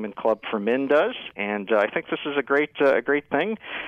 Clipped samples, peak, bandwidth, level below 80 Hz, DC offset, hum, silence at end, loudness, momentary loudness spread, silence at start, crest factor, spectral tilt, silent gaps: under 0.1%; -10 dBFS; 6.6 kHz; -68 dBFS; under 0.1%; none; 0 s; -23 LUFS; 7 LU; 0 s; 14 dB; -6.5 dB/octave; none